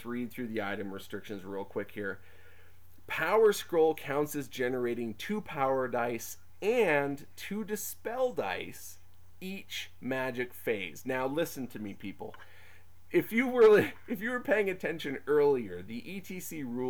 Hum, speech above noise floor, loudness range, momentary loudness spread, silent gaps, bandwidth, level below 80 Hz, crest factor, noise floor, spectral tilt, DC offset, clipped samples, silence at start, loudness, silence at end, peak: none; 29 dB; 8 LU; 15 LU; none; over 20 kHz; -68 dBFS; 18 dB; -60 dBFS; -5 dB/octave; 0.4%; under 0.1%; 0 s; -32 LUFS; 0 s; -14 dBFS